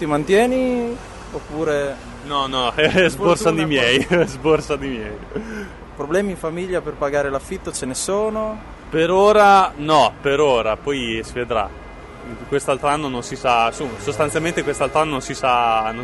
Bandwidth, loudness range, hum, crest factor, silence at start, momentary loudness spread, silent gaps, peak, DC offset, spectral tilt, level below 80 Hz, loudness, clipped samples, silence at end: 11.5 kHz; 7 LU; none; 18 dB; 0 s; 14 LU; none; -2 dBFS; under 0.1%; -4.5 dB/octave; -40 dBFS; -19 LUFS; under 0.1%; 0 s